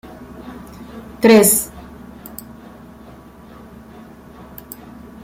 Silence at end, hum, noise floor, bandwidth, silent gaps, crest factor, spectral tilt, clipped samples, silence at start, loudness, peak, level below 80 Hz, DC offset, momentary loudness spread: 3.45 s; none; -40 dBFS; 16.5 kHz; none; 20 dB; -3.5 dB/octave; under 0.1%; 0.45 s; -13 LUFS; -2 dBFS; -48 dBFS; under 0.1%; 30 LU